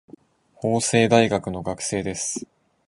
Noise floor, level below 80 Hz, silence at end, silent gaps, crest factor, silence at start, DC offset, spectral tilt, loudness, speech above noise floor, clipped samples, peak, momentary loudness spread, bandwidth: -51 dBFS; -52 dBFS; 0.45 s; none; 20 dB; 0.6 s; under 0.1%; -4.5 dB/octave; -22 LUFS; 29 dB; under 0.1%; -4 dBFS; 12 LU; 11.5 kHz